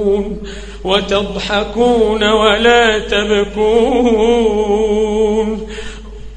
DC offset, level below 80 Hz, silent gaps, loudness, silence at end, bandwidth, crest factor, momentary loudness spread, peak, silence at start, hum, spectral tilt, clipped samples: under 0.1%; -30 dBFS; none; -13 LUFS; 0 s; 9.4 kHz; 14 dB; 15 LU; 0 dBFS; 0 s; none; -4.5 dB/octave; under 0.1%